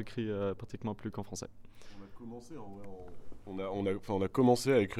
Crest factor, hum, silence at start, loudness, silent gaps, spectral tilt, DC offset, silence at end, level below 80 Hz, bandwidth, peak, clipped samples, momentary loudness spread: 20 dB; none; 0 s; -34 LUFS; none; -6 dB/octave; under 0.1%; 0 s; -58 dBFS; 15 kHz; -14 dBFS; under 0.1%; 23 LU